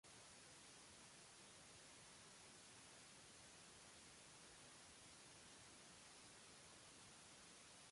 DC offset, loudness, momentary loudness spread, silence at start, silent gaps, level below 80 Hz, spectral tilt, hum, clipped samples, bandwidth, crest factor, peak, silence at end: under 0.1%; -62 LUFS; 0 LU; 0.05 s; none; -84 dBFS; -1.5 dB/octave; none; under 0.1%; 11.5 kHz; 14 dB; -52 dBFS; 0 s